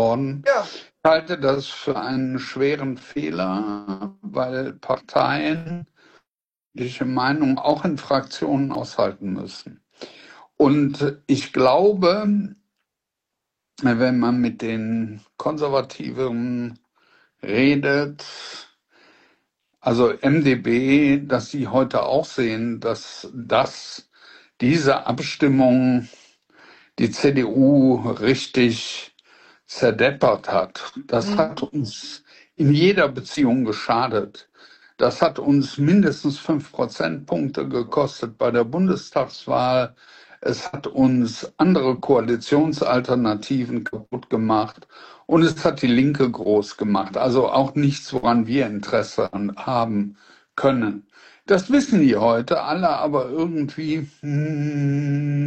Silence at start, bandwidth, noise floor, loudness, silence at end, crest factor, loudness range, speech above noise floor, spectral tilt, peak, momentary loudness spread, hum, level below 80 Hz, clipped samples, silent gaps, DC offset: 0 s; 8.6 kHz; -90 dBFS; -21 LUFS; 0 s; 18 dB; 4 LU; 70 dB; -6.5 dB/octave; -2 dBFS; 13 LU; none; -56 dBFS; under 0.1%; 6.67-6.71 s; under 0.1%